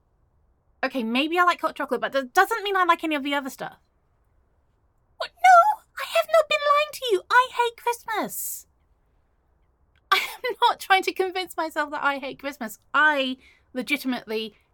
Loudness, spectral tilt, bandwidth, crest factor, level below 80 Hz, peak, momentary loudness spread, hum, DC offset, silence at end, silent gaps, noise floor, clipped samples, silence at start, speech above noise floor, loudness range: -23 LUFS; -2 dB/octave; 17.5 kHz; 20 dB; -66 dBFS; -4 dBFS; 14 LU; none; under 0.1%; 0.25 s; none; -66 dBFS; under 0.1%; 0.8 s; 41 dB; 5 LU